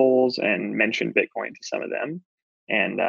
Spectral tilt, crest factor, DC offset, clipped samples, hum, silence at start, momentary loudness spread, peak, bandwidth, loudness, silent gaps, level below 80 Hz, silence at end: -5 dB/octave; 20 dB; under 0.1%; under 0.1%; none; 0 s; 11 LU; -4 dBFS; 7.4 kHz; -24 LUFS; 2.25-2.67 s; -76 dBFS; 0 s